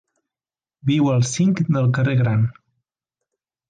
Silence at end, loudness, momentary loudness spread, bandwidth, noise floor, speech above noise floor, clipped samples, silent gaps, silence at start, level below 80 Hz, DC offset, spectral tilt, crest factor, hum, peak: 1.2 s; -19 LUFS; 4 LU; 9.4 kHz; under -90 dBFS; over 72 dB; under 0.1%; none; 0.85 s; -54 dBFS; under 0.1%; -6.5 dB/octave; 12 dB; none; -8 dBFS